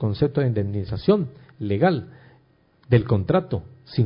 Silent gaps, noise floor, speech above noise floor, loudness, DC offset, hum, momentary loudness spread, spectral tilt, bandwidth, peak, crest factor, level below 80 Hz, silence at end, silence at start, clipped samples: none; -59 dBFS; 37 dB; -23 LUFS; under 0.1%; none; 11 LU; -12.5 dB/octave; 5.4 kHz; -6 dBFS; 18 dB; -44 dBFS; 0 s; 0 s; under 0.1%